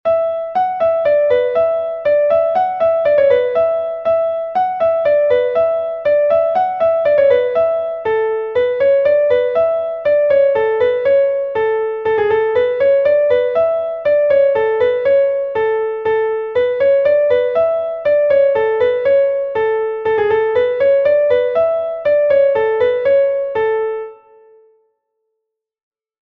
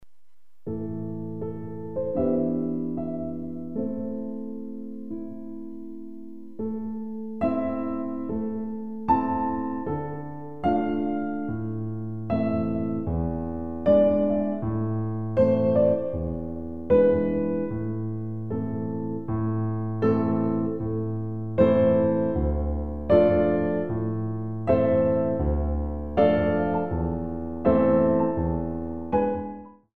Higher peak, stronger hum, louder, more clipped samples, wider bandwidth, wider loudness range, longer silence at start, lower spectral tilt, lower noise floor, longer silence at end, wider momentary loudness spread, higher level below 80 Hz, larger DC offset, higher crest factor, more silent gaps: first, -2 dBFS vs -6 dBFS; neither; first, -15 LUFS vs -26 LUFS; neither; about the same, 4.8 kHz vs 4.6 kHz; second, 1 LU vs 8 LU; about the same, 0.05 s vs 0 s; second, -6 dB/octave vs -11 dB/octave; about the same, -77 dBFS vs -78 dBFS; first, 2.05 s vs 0 s; second, 5 LU vs 14 LU; second, -54 dBFS vs -40 dBFS; second, under 0.1% vs 0.9%; second, 12 dB vs 18 dB; neither